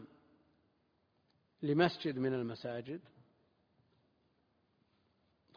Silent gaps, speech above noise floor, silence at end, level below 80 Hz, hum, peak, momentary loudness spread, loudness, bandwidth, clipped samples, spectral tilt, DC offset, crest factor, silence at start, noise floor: none; 41 dB; 2.55 s; -78 dBFS; none; -14 dBFS; 14 LU; -36 LUFS; 5.2 kHz; under 0.1%; -5 dB/octave; under 0.1%; 26 dB; 0 s; -77 dBFS